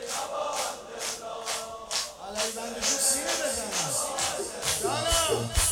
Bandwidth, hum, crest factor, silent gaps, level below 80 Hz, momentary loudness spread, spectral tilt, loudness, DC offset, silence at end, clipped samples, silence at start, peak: 18 kHz; none; 18 dB; none; -42 dBFS; 9 LU; -1.5 dB/octave; -28 LUFS; under 0.1%; 0 s; under 0.1%; 0 s; -10 dBFS